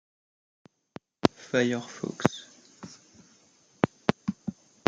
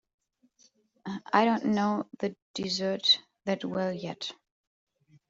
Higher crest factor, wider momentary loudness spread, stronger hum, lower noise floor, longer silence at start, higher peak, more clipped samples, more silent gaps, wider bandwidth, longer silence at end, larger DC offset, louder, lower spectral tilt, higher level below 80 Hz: first, 30 dB vs 24 dB; first, 23 LU vs 15 LU; neither; second, -62 dBFS vs -66 dBFS; first, 1.25 s vs 1.05 s; first, -2 dBFS vs -8 dBFS; neither; second, none vs 2.42-2.54 s; first, 9.6 kHz vs 7.8 kHz; second, 0.35 s vs 0.95 s; neither; about the same, -29 LUFS vs -29 LUFS; about the same, -5.5 dB/octave vs -4.5 dB/octave; first, -66 dBFS vs -72 dBFS